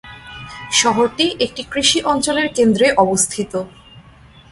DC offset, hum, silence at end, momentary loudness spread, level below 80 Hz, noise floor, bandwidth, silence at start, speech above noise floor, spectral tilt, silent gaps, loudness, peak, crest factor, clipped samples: under 0.1%; none; 0.5 s; 19 LU; -48 dBFS; -44 dBFS; 12 kHz; 0.05 s; 28 dB; -2.5 dB/octave; none; -16 LUFS; 0 dBFS; 18 dB; under 0.1%